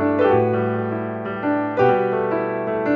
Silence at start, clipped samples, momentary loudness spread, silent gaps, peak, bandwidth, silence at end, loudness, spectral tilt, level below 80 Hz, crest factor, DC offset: 0 s; under 0.1%; 8 LU; none; -4 dBFS; 5.6 kHz; 0 s; -20 LUFS; -9.5 dB/octave; -58 dBFS; 14 dB; under 0.1%